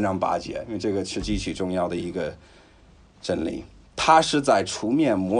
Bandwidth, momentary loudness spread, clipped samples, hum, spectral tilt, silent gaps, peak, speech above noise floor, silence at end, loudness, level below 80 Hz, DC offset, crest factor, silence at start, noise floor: 11 kHz; 14 LU; under 0.1%; none; -4.5 dB/octave; none; -4 dBFS; 29 dB; 0 s; -24 LUFS; -44 dBFS; under 0.1%; 20 dB; 0 s; -53 dBFS